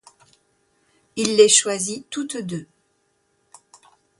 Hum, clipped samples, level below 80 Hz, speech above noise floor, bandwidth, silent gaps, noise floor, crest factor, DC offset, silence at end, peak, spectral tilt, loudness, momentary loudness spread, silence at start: none; under 0.1%; -68 dBFS; 48 dB; 11.5 kHz; none; -68 dBFS; 22 dB; under 0.1%; 1.55 s; -2 dBFS; -2 dB/octave; -19 LUFS; 19 LU; 1.15 s